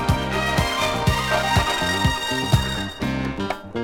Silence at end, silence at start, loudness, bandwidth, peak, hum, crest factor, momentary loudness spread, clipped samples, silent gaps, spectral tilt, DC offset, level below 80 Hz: 0 s; 0 s; -21 LUFS; 17.5 kHz; -4 dBFS; none; 18 dB; 6 LU; under 0.1%; none; -4.5 dB/octave; under 0.1%; -32 dBFS